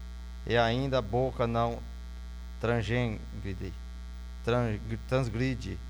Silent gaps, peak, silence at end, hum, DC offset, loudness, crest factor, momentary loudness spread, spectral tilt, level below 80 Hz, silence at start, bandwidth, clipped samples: none; -12 dBFS; 0 s; none; under 0.1%; -31 LUFS; 20 dB; 16 LU; -7 dB/octave; -42 dBFS; 0 s; 18.5 kHz; under 0.1%